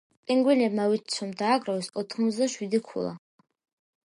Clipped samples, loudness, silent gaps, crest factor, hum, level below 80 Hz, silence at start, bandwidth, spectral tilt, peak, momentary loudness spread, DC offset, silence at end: under 0.1%; -27 LUFS; none; 16 dB; none; -76 dBFS; 0.3 s; 11.5 kHz; -4.5 dB/octave; -12 dBFS; 11 LU; under 0.1%; 0.9 s